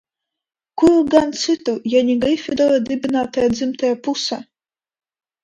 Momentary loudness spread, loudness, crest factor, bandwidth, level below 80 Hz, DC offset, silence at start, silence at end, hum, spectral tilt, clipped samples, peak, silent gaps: 7 LU; -18 LUFS; 18 dB; 10.5 kHz; -52 dBFS; under 0.1%; 0.75 s; 1 s; none; -4.5 dB/octave; under 0.1%; 0 dBFS; none